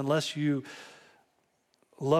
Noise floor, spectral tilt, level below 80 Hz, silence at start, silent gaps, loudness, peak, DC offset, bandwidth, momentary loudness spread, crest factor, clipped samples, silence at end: -73 dBFS; -5.5 dB/octave; -74 dBFS; 0 s; none; -31 LUFS; -12 dBFS; under 0.1%; 14.5 kHz; 19 LU; 20 dB; under 0.1%; 0 s